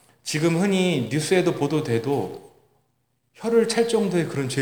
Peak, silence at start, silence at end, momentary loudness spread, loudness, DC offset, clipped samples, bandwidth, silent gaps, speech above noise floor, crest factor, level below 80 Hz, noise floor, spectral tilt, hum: -6 dBFS; 0.25 s; 0 s; 7 LU; -22 LUFS; under 0.1%; under 0.1%; over 20 kHz; none; 49 dB; 16 dB; -66 dBFS; -71 dBFS; -5.5 dB/octave; none